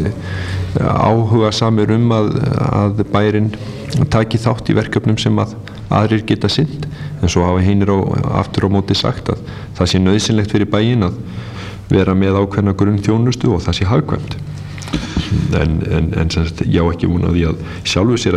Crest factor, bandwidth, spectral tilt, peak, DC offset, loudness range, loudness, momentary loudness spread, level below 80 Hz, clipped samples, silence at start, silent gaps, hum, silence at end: 14 dB; 11 kHz; -6.5 dB/octave; 0 dBFS; under 0.1%; 2 LU; -15 LUFS; 9 LU; -32 dBFS; under 0.1%; 0 s; none; none; 0 s